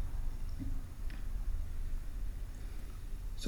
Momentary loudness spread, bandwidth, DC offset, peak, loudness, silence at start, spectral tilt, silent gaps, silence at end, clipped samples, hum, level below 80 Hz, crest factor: 5 LU; 14.5 kHz; under 0.1%; -22 dBFS; -45 LUFS; 0 s; -5.5 dB/octave; none; 0 s; under 0.1%; none; -38 dBFS; 14 dB